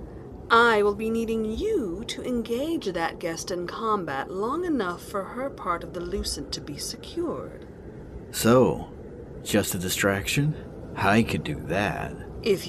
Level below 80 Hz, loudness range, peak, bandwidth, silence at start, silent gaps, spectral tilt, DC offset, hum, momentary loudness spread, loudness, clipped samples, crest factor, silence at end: -46 dBFS; 6 LU; -6 dBFS; 14 kHz; 0 s; none; -4.5 dB/octave; under 0.1%; none; 16 LU; -26 LUFS; under 0.1%; 20 dB; 0 s